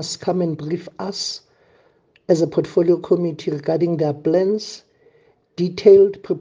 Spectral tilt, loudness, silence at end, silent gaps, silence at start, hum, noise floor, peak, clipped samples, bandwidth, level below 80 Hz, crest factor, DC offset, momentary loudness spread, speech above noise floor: -6.5 dB/octave; -19 LUFS; 0 s; none; 0 s; none; -57 dBFS; 0 dBFS; under 0.1%; 9.6 kHz; -64 dBFS; 18 dB; under 0.1%; 16 LU; 39 dB